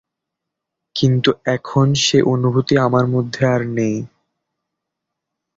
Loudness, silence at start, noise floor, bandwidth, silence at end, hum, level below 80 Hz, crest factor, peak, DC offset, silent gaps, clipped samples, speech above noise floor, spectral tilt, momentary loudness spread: -17 LUFS; 0.95 s; -81 dBFS; 7.8 kHz; 1.5 s; none; -52 dBFS; 16 dB; -2 dBFS; under 0.1%; none; under 0.1%; 65 dB; -5.5 dB/octave; 7 LU